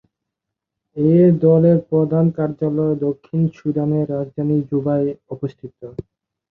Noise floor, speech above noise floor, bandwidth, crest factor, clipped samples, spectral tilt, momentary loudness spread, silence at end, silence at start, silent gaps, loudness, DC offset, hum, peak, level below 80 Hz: -82 dBFS; 65 dB; 3.9 kHz; 16 dB; under 0.1%; -12.5 dB/octave; 19 LU; 0.5 s; 0.95 s; none; -18 LUFS; under 0.1%; none; -2 dBFS; -56 dBFS